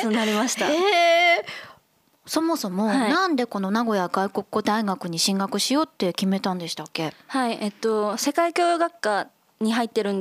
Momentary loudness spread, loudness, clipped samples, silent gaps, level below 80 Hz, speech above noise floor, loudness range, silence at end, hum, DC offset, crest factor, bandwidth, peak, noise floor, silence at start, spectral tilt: 9 LU; -23 LUFS; under 0.1%; none; -76 dBFS; 39 dB; 3 LU; 0 s; none; under 0.1%; 16 dB; 15.5 kHz; -8 dBFS; -62 dBFS; 0 s; -4 dB/octave